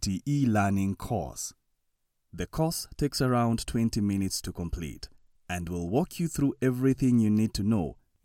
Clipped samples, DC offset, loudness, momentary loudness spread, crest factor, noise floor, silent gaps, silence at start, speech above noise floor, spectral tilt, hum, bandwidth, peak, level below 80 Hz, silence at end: under 0.1%; under 0.1%; -29 LUFS; 13 LU; 16 dB; -76 dBFS; none; 0 s; 48 dB; -6 dB/octave; none; 17 kHz; -12 dBFS; -46 dBFS; 0.3 s